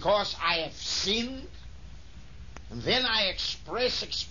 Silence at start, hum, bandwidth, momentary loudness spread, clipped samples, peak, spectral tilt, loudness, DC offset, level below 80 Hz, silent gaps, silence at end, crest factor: 0 s; none; 7.4 kHz; 23 LU; under 0.1%; -14 dBFS; -2.5 dB/octave; -28 LUFS; 0.5%; -48 dBFS; none; 0 s; 18 dB